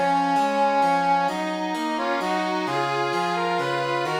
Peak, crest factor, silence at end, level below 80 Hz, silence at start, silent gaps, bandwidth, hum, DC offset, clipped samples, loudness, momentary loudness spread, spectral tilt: -10 dBFS; 12 dB; 0 s; -72 dBFS; 0 s; none; 18 kHz; none; under 0.1%; under 0.1%; -23 LUFS; 5 LU; -5 dB/octave